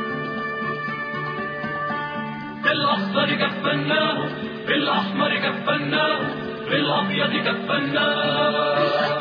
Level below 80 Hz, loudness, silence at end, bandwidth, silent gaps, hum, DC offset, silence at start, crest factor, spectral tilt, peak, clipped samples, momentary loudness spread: -62 dBFS; -22 LUFS; 0 s; 5.2 kHz; none; none; under 0.1%; 0 s; 16 dB; -7 dB/octave; -6 dBFS; under 0.1%; 7 LU